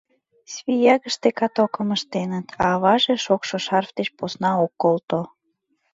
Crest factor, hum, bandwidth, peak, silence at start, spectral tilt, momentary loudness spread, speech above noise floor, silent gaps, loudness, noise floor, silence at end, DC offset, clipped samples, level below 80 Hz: 18 dB; none; 7.8 kHz; -4 dBFS; 0.5 s; -5 dB/octave; 10 LU; 51 dB; 5.04-5.08 s; -21 LUFS; -71 dBFS; 0.65 s; under 0.1%; under 0.1%; -58 dBFS